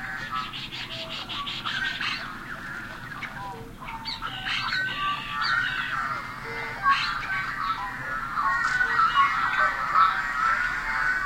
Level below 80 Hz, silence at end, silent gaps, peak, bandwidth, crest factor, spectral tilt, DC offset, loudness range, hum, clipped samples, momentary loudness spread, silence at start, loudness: -48 dBFS; 0 s; none; -8 dBFS; 16.5 kHz; 20 dB; -2.5 dB/octave; under 0.1%; 8 LU; none; under 0.1%; 14 LU; 0 s; -26 LUFS